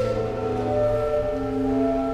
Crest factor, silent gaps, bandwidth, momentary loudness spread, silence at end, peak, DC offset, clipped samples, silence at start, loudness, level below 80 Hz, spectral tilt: 12 dB; none; 11.5 kHz; 3 LU; 0 s; -12 dBFS; under 0.1%; under 0.1%; 0 s; -24 LUFS; -38 dBFS; -8 dB/octave